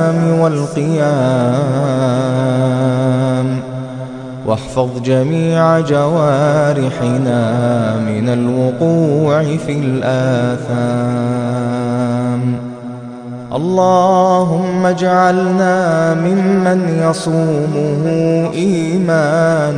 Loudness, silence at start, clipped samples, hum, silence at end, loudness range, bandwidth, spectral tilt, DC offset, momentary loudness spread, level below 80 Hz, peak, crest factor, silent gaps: -14 LUFS; 0 s; under 0.1%; none; 0 s; 4 LU; 10.5 kHz; -7.5 dB/octave; under 0.1%; 7 LU; -50 dBFS; 0 dBFS; 12 dB; none